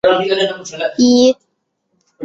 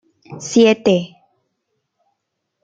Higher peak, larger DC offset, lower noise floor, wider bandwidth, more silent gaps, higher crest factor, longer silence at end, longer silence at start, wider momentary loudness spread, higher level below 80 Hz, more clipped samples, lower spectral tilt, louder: about the same, -2 dBFS vs -2 dBFS; neither; second, -69 dBFS vs -75 dBFS; second, 7.8 kHz vs 9 kHz; neither; about the same, 14 dB vs 18 dB; second, 0 s vs 1.6 s; second, 0.05 s vs 0.3 s; second, 11 LU vs 19 LU; first, -56 dBFS vs -62 dBFS; neither; second, -3.5 dB/octave vs -5 dB/octave; about the same, -14 LUFS vs -15 LUFS